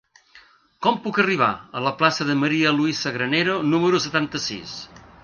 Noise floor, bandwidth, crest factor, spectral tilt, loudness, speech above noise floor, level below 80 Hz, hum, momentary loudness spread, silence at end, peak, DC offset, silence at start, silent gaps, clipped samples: -52 dBFS; 7.2 kHz; 20 dB; -4.5 dB/octave; -21 LUFS; 31 dB; -60 dBFS; none; 9 LU; 0.25 s; -4 dBFS; under 0.1%; 0.35 s; none; under 0.1%